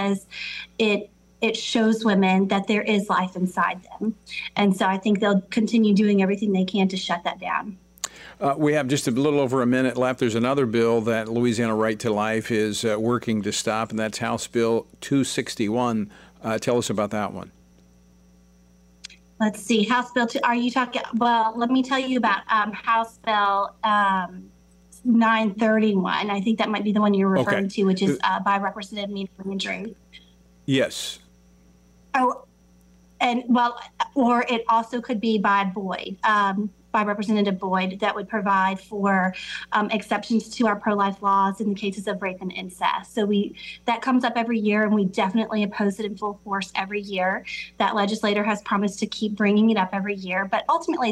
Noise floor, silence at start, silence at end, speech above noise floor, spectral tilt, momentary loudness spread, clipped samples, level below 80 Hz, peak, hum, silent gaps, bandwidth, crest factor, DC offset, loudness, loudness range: -55 dBFS; 0 s; 0 s; 32 dB; -5 dB/octave; 9 LU; under 0.1%; -60 dBFS; -6 dBFS; none; none; 15 kHz; 18 dB; under 0.1%; -23 LUFS; 5 LU